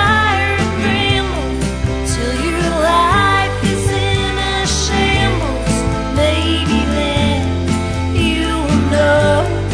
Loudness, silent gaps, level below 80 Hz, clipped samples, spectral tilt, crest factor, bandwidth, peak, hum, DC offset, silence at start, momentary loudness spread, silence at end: -15 LUFS; none; -24 dBFS; under 0.1%; -5 dB/octave; 14 dB; 11 kHz; 0 dBFS; none; under 0.1%; 0 s; 6 LU; 0 s